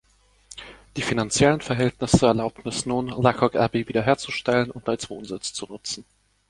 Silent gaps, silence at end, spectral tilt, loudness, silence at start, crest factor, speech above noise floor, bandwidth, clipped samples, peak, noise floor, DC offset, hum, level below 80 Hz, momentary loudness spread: none; 0.5 s; -5 dB/octave; -23 LUFS; 0.55 s; 22 dB; 28 dB; 11.5 kHz; under 0.1%; -2 dBFS; -51 dBFS; under 0.1%; none; -46 dBFS; 14 LU